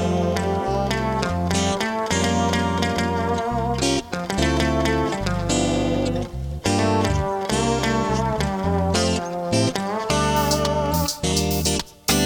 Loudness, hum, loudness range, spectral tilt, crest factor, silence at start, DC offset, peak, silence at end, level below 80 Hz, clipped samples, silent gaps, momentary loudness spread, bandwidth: -22 LUFS; none; 1 LU; -4.5 dB/octave; 18 dB; 0 s; under 0.1%; -2 dBFS; 0 s; -34 dBFS; under 0.1%; none; 3 LU; 19 kHz